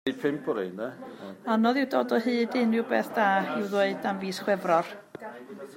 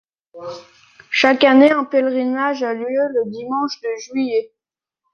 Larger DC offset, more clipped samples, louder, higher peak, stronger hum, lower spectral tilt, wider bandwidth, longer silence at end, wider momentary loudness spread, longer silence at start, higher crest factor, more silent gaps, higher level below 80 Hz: neither; neither; second, -27 LUFS vs -17 LUFS; second, -10 dBFS vs -2 dBFS; neither; first, -5.5 dB/octave vs -4 dB/octave; first, 16 kHz vs 7 kHz; second, 0 s vs 0.65 s; second, 17 LU vs 21 LU; second, 0.05 s vs 0.35 s; about the same, 18 dB vs 16 dB; neither; second, -78 dBFS vs -68 dBFS